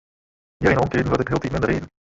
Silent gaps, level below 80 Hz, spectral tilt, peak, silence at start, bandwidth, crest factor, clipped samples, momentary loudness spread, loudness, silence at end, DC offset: none; -40 dBFS; -7 dB/octave; -2 dBFS; 0.6 s; 8 kHz; 20 dB; under 0.1%; 4 LU; -21 LUFS; 0.3 s; under 0.1%